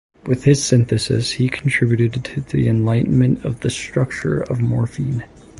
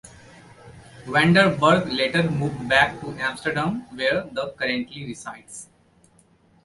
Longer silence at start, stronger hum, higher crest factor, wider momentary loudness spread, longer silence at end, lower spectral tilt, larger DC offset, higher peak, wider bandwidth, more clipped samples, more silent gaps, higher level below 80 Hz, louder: first, 0.25 s vs 0.05 s; neither; second, 16 dB vs 22 dB; second, 8 LU vs 20 LU; second, 0.35 s vs 1 s; about the same, -6 dB/octave vs -5.5 dB/octave; neither; about the same, -2 dBFS vs -2 dBFS; about the same, 11.5 kHz vs 11.5 kHz; neither; neither; first, -42 dBFS vs -54 dBFS; first, -18 LUFS vs -21 LUFS